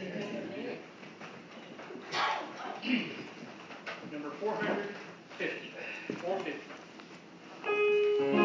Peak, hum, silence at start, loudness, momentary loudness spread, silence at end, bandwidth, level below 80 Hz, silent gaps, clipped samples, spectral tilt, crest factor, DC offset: -14 dBFS; none; 0 s; -35 LUFS; 20 LU; 0 s; 7.6 kHz; -82 dBFS; none; under 0.1%; -5 dB/octave; 20 dB; under 0.1%